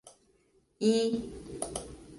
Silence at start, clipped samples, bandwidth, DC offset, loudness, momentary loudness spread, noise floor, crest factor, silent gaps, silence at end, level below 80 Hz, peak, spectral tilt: 0.05 s; under 0.1%; 11.5 kHz; under 0.1%; -32 LUFS; 14 LU; -69 dBFS; 18 dB; none; 0 s; -56 dBFS; -14 dBFS; -4.5 dB/octave